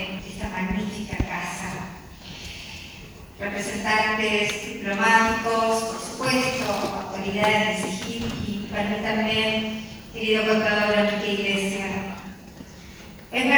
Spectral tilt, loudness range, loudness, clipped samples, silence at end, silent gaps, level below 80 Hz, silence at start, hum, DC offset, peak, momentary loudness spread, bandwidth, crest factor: -4 dB/octave; 6 LU; -24 LUFS; under 0.1%; 0 s; none; -46 dBFS; 0 s; none; under 0.1%; -2 dBFS; 18 LU; over 20 kHz; 22 dB